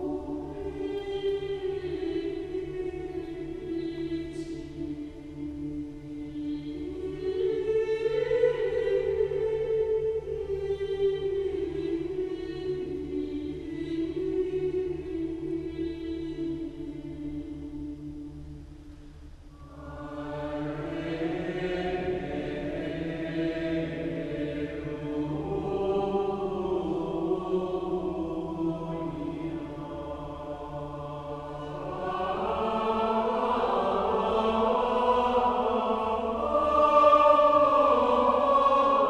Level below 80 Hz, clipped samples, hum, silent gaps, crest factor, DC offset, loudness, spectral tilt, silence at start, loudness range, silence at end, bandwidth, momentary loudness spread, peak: -48 dBFS; under 0.1%; none; none; 20 dB; under 0.1%; -29 LUFS; -7.5 dB/octave; 0 s; 12 LU; 0 s; 10 kHz; 15 LU; -8 dBFS